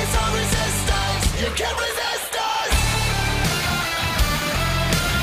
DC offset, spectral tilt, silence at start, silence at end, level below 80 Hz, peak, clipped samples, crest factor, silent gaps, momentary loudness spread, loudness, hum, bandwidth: under 0.1%; -3 dB/octave; 0 s; 0 s; -28 dBFS; -8 dBFS; under 0.1%; 14 dB; none; 3 LU; -21 LUFS; none; 16 kHz